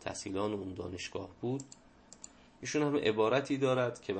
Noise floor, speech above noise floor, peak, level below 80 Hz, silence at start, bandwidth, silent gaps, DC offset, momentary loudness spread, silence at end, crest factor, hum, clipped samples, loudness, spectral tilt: -55 dBFS; 22 dB; -16 dBFS; -68 dBFS; 0 s; 8.8 kHz; none; under 0.1%; 22 LU; 0 s; 18 dB; none; under 0.1%; -34 LUFS; -5 dB/octave